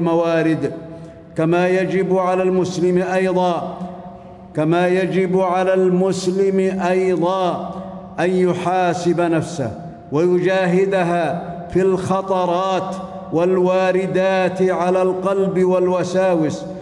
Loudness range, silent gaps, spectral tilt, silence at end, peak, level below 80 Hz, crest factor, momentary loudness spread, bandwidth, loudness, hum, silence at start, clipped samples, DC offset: 2 LU; none; -7 dB/octave; 0 s; -4 dBFS; -54 dBFS; 12 dB; 11 LU; 11.5 kHz; -18 LUFS; none; 0 s; under 0.1%; under 0.1%